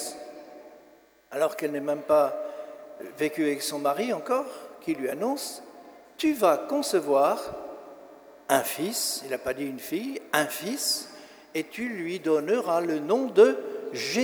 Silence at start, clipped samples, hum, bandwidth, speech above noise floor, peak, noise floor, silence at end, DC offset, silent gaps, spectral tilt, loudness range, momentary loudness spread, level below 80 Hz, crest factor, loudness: 0 s; under 0.1%; none; over 20 kHz; 31 dB; -6 dBFS; -57 dBFS; 0 s; under 0.1%; none; -3 dB/octave; 4 LU; 19 LU; -70 dBFS; 22 dB; -27 LUFS